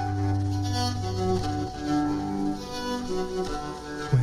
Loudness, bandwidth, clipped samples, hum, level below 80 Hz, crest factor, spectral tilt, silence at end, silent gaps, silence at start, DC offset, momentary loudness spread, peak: -29 LUFS; 13.5 kHz; under 0.1%; none; -44 dBFS; 14 dB; -6.5 dB/octave; 0 s; none; 0 s; under 0.1%; 5 LU; -12 dBFS